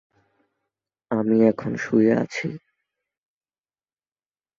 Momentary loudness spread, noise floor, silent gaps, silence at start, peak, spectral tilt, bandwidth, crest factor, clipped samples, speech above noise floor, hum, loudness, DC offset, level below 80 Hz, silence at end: 12 LU; under -90 dBFS; none; 1.1 s; -4 dBFS; -7.5 dB/octave; 7.4 kHz; 20 dB; under 0.1%; over 70 dB; none; -22 LUFS; under 0.1%; -64 dBFS; 2 s